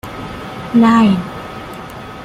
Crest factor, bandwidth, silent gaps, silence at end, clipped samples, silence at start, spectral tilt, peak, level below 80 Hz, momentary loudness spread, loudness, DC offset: 14 dB; 14 kHz; none; 0 s; under 0.1%; 0.05 s; -7 dB/octave; -2 dBFS; -42 dBFS; 20 LU; -12 LUFS; under 0.1%